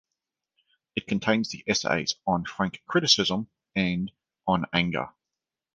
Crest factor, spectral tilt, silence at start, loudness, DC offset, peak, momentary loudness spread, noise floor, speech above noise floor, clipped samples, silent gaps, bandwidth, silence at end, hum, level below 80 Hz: 24 dB; -4 dB/octave; 0.95 s; -26 LUFS; under 0.1%; -4 dBFS; 13 LU; -88 dBFS; 62 dB; under 0.1%; none; 9.8 kHz; 0.65 s; none; -56 dBFS